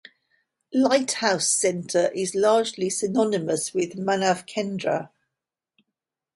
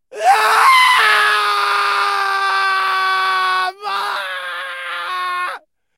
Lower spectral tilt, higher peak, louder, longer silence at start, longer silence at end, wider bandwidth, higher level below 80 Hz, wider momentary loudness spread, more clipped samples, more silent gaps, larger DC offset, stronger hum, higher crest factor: first, -3.5 dB/octave vs 1.5 dB/octave; second, -4 dBFS vs 0 dBFS; second, -23 LUFS vs -15 LUFS; first, 0.7 s vs 0.1 s; first, 1.3 s vs 0.4 s; second, 11.5 kHz vs 16 kHz; first, -70 dBFS vs -80 dBFS; second, 7 LU vs 14 LU; neither; neither; neither; neither; about the same, 20 dB vs 16 dB